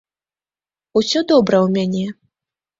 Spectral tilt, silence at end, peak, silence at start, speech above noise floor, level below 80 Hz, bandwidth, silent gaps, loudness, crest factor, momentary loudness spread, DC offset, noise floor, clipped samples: -5.5 dB/octave; 0.65 s; -2 dBFS; 0.95 s; over 74 dB; -58 dBFS; 7.8 kHz; none; -17 LUFS; 18 dB; 9 LU; under 0.1%; under -90 dBFS; under 0.1%